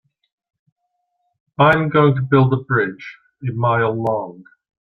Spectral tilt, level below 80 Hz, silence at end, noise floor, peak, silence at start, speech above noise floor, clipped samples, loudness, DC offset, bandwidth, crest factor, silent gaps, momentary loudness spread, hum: -9 dB/octave; -54 dBFS; 0.4 s; -72 dBFS; -2 dBFS; 1.6 s; 55 dB; under 0.1%; -17 LUFS; under 0.1%; 5.8 kHz; 18 dB; none; 20 LU; none